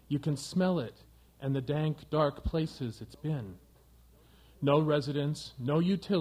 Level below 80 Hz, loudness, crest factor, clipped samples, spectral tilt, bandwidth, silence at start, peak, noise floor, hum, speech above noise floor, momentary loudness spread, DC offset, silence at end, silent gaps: -50 dBFS; -32 LUFS; 20 dB; under 0.1%; -7 dB/octave; 14.5 kHz; 0.1 s; -12 dBFS; -60 dBFS; none; 29 dB; 12 LU; under 0.1%; 0 s; none